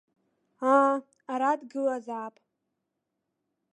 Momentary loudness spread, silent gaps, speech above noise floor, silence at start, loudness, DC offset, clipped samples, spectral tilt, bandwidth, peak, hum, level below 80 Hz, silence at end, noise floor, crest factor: 15 LU; none; 56 dB; 0.6 s; -27 LUFS; under 0.1%; under 0.1%; -5 dB/octave; 10.5 kHz; -10 dBFS; none; -90 dBFS; 1.45 s; -83 dBFS; 22 dB